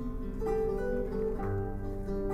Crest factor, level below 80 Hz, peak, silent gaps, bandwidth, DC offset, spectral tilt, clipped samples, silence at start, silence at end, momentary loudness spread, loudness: 12 dB; -38 dBFS; -20 dBFS; none; 14 kHz; under 0.1%; -9 dB/octave; under 0.1%; 0 s; 0 s; 6 LU; -34 LUFS